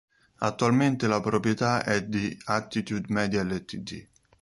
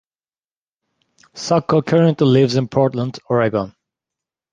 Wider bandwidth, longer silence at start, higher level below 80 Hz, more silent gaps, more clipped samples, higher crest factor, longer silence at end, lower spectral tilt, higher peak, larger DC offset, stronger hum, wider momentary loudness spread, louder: first, 11.5 kHz vs 9.4 kHz; second, 0.4 s vs 1.35 s; about the same, -56 dBFS vs -56 dBFS; neither; neither; about the same, 20 dB vs 16 dB; second, 0.35 s vs 0.8 s; second, -5.5 dB/octave vs -7 dB/octave; second, -8 dBFS vs -2 dBFS; neither; neither; about the same, 11 LU vs 11 LU; second, -27 LUFS vs -17 LUFS